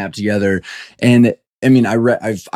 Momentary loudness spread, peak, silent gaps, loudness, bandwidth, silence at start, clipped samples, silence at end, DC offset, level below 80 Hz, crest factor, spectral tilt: 8 LU; -2 dBFS; 1.47-1.62 s; -14 LUFS; 13 kHz; 0 s; under 0.1%; 0.05 s; under 0.1%; -54 dBFS; 12 dB; -7 dB/octave